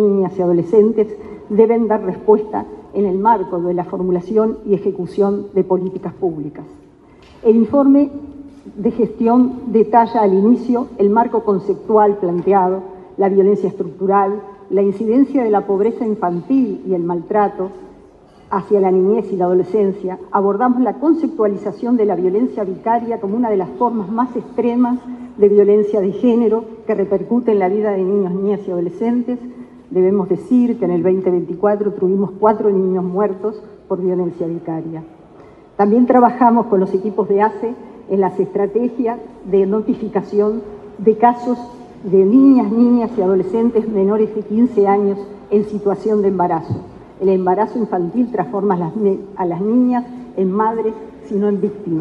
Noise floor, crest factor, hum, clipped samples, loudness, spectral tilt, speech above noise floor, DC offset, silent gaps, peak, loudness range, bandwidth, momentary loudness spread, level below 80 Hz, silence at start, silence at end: -44 dBFS; 16 dB; none; under 0.1%; -16 LUFS; -10 dB/octave; 29 dB; under 0.1%; none; 0 dBFS; 4 LU; 5 kHz; 10 LU; -54 dBFS; 0 s; 0 s